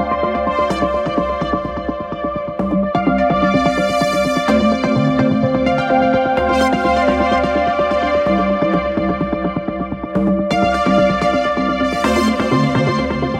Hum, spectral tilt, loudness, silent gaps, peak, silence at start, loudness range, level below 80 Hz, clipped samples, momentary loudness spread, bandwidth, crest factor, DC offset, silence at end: none; -6.5 dB/octave; -16 LUFS; none; -2 dBFS; 0 s; 3 LU; -36 dBFS; under 0.1%; 6 LU; 14.5 kHz; 14 dB; under 0.1%; 0 s